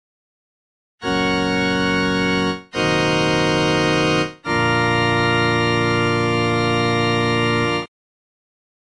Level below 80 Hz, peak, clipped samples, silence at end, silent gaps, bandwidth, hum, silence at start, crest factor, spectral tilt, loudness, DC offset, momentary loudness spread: -44 dBFS; -6 dBFS; under 0.1%; 1 s; none; 11 kHz; none; 1 s; 14 dB; -5.5 dB/octave; -18 LUFS; 0.2%; 5 LU